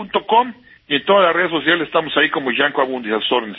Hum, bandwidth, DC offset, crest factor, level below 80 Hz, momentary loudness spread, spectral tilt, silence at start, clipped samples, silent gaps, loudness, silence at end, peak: none; 5.2 kHz; under 0.1%; 16 dB; -60 dBFS; 7 LU; -8 dB/octave; 0 s; under 0.1%; none; -17 LUFS; 0 s; 0 dBFS